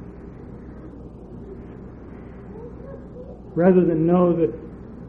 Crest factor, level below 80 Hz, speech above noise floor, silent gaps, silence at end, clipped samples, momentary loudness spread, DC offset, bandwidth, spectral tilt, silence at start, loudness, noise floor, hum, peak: 20 dB; -44 dBFS; 21 dB; none; 0 s; under 0.1%; 22 LU; under 0.1%; 3.5 kHz; -12 dB/octave; 0 s; -19 LUFS; -39 dBFS; none; -4 dBFS